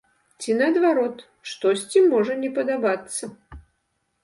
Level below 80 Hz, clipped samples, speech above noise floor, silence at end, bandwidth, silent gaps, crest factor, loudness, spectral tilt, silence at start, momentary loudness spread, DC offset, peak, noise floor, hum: -56 dBFS; under 0.1%; 51 dB; 0.65 s; 11.5 kHz; none; 16 dB; -22 LUFS; -4 dB/octave; 0.4 s; 16 LU; under 0.1%; -6 dBFS; -73 dBFS; none